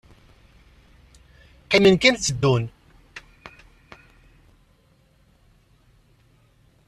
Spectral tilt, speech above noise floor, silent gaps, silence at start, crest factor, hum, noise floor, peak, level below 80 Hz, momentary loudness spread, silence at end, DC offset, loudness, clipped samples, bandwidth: -4.5 dB/octave; 42 dB; none; 1.7 s; 24 dB; none; -59 dBFS; -2 dBFS; -52 dBFS; 28 LU; 3.7 s; under 0.1%; -19 LUFS; under 0.1%; 12.5 kHz